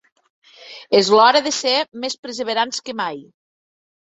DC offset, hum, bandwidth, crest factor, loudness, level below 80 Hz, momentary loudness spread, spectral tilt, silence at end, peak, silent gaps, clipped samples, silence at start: under 0.1%; none; 8.4 kHz; 18 dB; -18 LUFS; -66 dBFS; 18 LU; -2.5 dB/octave; 0.9 s; -2 dBFS; 2.18-2.23 s; under 0.1%; 0.6 s